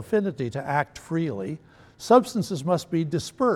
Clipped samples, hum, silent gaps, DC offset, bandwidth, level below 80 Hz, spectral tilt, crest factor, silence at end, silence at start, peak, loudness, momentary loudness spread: under 0.1%; none; none; under 0.1%; 15.5 kHz; -60 dBFS; -6 dB/octave; 20 dB; 0 s; 0 s; -6 dBFS; -25 LUFS; 14 LU